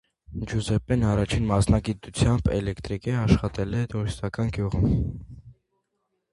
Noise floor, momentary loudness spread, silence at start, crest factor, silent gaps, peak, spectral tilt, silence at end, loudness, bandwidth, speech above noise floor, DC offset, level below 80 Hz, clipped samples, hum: -77 dBFS; 9 LU; 0.3 s; 22 dB; none; -2 dBFS; -7 dB/octave; 0.8 s; -25 LUFS; 11.5 kHz; 53 dB; under 0.1%; -36 dBFS; under 0.1%; none